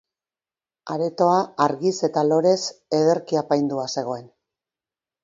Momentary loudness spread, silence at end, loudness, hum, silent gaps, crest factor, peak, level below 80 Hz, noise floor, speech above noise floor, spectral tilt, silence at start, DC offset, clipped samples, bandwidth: 10 LU; 0.95 s; -22 LUFS; none; none; 20 dB; -4 dBFS; -70 dBFS; under -90 dBFS; over 69 dB; -5.5 dB/octave; 0.85 s; under 0.1%; under 0.1%; 7.8 kHz